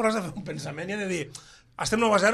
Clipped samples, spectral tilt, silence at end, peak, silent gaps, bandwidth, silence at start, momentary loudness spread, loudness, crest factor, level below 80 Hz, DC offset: under 0.1%; -4 dB/octave; 0 s; -10 dBFS; none; 14 kHz; 0 s; 17 LU; -28 LUFS; 16 dB; -56 dBFS; under 0.1%